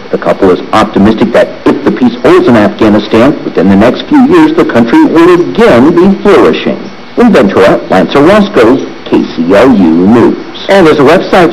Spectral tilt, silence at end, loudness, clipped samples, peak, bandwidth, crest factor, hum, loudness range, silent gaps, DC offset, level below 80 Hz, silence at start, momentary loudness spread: -7 dB/octave; 0 s; -5 LUFS; 9%; 0 dBFS; 13 kHz; 4 dB; none; 2 LU; none; 3%; -32 dBFS; 0 s; 6 LU